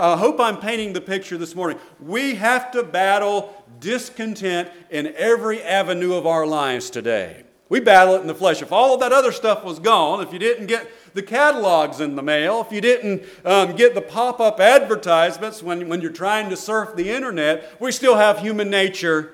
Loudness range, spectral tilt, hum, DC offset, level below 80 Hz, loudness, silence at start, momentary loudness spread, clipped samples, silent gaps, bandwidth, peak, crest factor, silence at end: 5 LU; -3.5 dB/octave; none; under 0.1%; -64 dBFS; -19 LUFS; 0 s; 12 LU; under 0.1%; none; 16.5 kHz; 0 dBFS; 18 dB; 0.05 s